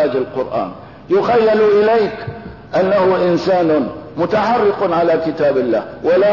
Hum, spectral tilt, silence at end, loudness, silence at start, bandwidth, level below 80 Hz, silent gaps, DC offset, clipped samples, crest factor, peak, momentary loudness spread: none; -7.5 dB/octave; 0 s; -15 LUFS; 0 s; 6 kHz; -50 dBFS; none; 0.3%; under 0.1%; 10 dB; -6 dBFS; 11 LU